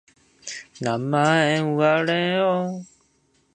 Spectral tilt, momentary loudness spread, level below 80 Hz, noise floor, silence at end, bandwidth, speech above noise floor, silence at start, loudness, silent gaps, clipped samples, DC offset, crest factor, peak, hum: -5.5 dB/octave; 17 LU; -66 dBFS; -64 dBFS; 0.7 s; 9.8 kHz; 43 dB; 0.45 s; -21 LUFS; none; under 0.1%; under 0.1%; 18 dB; -4 dBFS; none